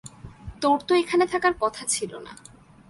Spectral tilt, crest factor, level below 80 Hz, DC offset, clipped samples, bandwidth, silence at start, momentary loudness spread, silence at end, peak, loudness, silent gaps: -3 dB/octave; 16 dB; -52 dBFS; under 0.1%; under 0.1%; 11.5 kHz; 0.05 s; 22 LU; 0.55 s; -8 dBFS; -23 LUFS; none